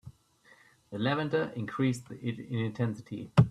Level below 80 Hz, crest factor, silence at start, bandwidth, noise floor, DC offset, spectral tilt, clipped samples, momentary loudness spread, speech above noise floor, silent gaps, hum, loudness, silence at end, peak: -58 dBFS; 22 dB; 0.05 s; 12 kHz; -62 dBFS; under 0.1%; -7.5 dB/octave; under 0.1%; 10 LU; 32 dB; none; none; -32 LUFS; 0 s; -8 dBFS